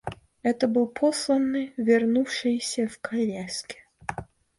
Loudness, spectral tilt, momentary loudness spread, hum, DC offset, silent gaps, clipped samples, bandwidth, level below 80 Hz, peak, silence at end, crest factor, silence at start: -25 LUFS; -4.5 dB/octave; 14 LU; none; under 0.1%; none; under 0.1%; 11.5 kHz; -60 dBFS; -10 dBFS; 0.35 s; 16 dB; 0.05 s